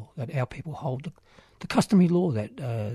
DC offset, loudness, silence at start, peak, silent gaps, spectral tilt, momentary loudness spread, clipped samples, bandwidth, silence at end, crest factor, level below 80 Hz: under 0.1%; -26 LUFS; 0 s; -8 dBFS; none; -7 dB/octave; 15 LU; under 0.1%; 13.5 kHz; 0 s; 18 dB; -58 dBFS